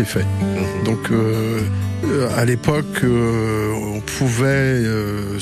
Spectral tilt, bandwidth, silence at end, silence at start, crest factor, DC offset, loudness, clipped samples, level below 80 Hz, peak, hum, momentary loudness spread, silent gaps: -6 dB/octave; 15 kHz; 0 s; 0 s; 14 dB; under 0.1%; -19 LUFS; under 0.1%; -40 dBFS; -4 dBFS; none; 5 LU; none